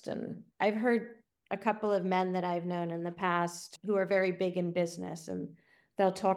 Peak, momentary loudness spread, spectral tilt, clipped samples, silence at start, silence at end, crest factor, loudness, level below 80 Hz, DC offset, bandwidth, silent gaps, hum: -12 dBFS; 12 LU; -6 dB/octave; under 0.1%; 0.05 s; 0 s; 20 dB; -33 LUFS; -78 dBFS; under 0.1%; 13.5 kHz; none; none